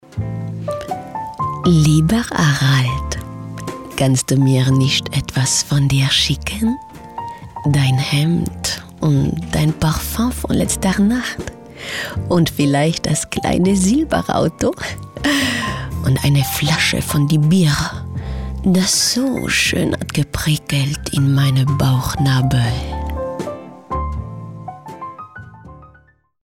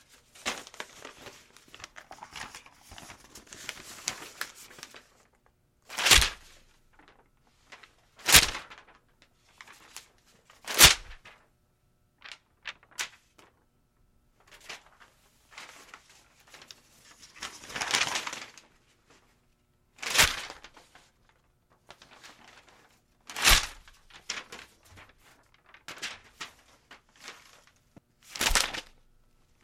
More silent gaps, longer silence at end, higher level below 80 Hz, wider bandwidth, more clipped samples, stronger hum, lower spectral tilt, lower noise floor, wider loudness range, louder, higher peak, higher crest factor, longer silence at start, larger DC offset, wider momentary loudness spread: neither; second, 0.6 s vs 0.85 s; first, -34 dBFS vs -46 dBFS; about the same, 17 kHz vs 16.5 kHz; neither; neither; first, -5 dB/octave vs 0 dB/octave; second, -52 dBFS vs -69 dBFS; second, 3 LU vs 20 LU; first, -17 LUFS vs -25 LUFS; second, -4 dBFS vs 0 dBFS; second, 14 dB vs 32 dB; second, 0.1 s vs 0.45 s; neither; second, 14 LU vs 29 LU